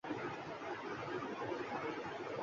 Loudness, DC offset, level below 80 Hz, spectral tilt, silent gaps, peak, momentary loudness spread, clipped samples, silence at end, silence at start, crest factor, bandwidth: -43 LUFS; under 0.1%; -74 dBFS; -3.5 dB/octave; none; -28 dBFS; 3 LU; under 0.1%; 0 s; 0.05 s; 14 dB; 7.4 kHz